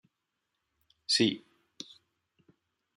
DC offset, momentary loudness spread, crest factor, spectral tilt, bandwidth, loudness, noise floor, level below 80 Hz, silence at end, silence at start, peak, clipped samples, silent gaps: under 0.1%; 21 LU; 24 dB; -3 dB/octave; 12.5 kHz; -28 LUFS; -84 dBFS; -82 dBFS; 1.6 s; 1.1 s; -12 dBFS; under 0.1%; none